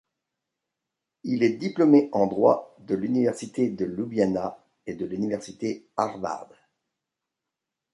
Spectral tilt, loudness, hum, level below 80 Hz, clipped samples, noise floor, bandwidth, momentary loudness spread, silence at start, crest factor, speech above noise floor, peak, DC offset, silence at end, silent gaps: -7 dB/octave; -25 LUFS; none; -64 dBFS; under 0.1%; -86 dBFS; 11.5 kHz; 14 LU; 1.25 s; 20 dB; 62 dB; -6 dBFS; under 0.1%; 1.5 s; none